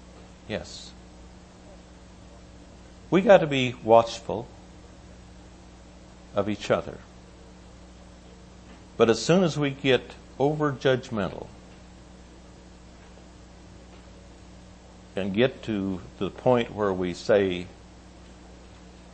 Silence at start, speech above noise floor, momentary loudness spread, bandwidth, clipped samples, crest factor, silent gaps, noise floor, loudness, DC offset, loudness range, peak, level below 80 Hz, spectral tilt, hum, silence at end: 0.05 s; 24 dB; 24 LU; 8.8 kHz; under 0.1%; 24 dB; none; -48 dBFS; -25 LUFS; under 0.1%; 10 LU; -4 dBFS; -52 dBFS; -6 dB/octave; none; 0.45 s